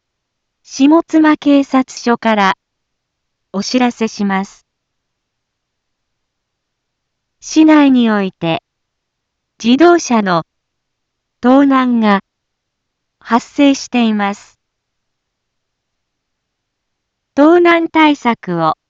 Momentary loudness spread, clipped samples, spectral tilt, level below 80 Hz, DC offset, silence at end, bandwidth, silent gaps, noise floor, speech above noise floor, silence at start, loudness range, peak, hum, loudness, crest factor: 11 LU; under 0.1%; -5 dB/octave; -60 dBFS; under 0.1%; 0.15 s; 7.8 kHz; none; -73 dBFS; 62 dB; 0.7 s; 8 LU; 0 dBFS; none; -12 LUFS; 14 dB